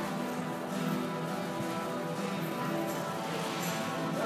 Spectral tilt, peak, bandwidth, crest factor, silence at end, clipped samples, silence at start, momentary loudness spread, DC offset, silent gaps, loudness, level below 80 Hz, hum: -5 dB/octave; -20 dBFS; 15.5 kHz; 14 dB; 0 s; under 0.1%; 0 s; 2 LU; under 0.1%; none; -34 LUFS; -74 dBFS; none